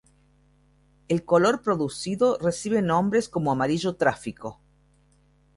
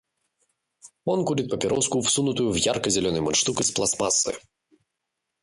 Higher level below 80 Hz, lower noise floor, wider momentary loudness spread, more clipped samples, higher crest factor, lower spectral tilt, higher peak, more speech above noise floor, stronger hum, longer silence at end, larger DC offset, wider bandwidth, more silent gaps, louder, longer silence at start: about the same, -58 dBFS vs -54 dBFS; second, -61 dBFS vs -82 dBFS; first, 10 LU vs 5 LU; neither; about the same, 18 dB vs 18 dB; first, -5.5 dB/octave vs -3 dB/octave; about the same, -8 dBFS vs -8 dBFS; second, 37 dB vs 58 dB; neither; about the same, 1.05 s vs 1.05 s; neither; about the same, 11.5 kHz vs 11.5 kHz; neither; about the same, -24 LUFS vs -23 LUFS; first, 1.1 s vs 0.85 s